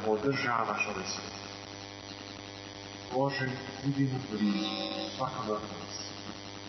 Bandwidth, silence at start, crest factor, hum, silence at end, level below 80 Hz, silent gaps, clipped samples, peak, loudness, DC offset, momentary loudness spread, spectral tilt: 6.4 kHz; 0 s; 18 dB; none; 0 s; -64 dBFS; none; under 0.1%; -16 dBFS; -34 LUFS; under 0.1%; 13 LU; -5 dB/octave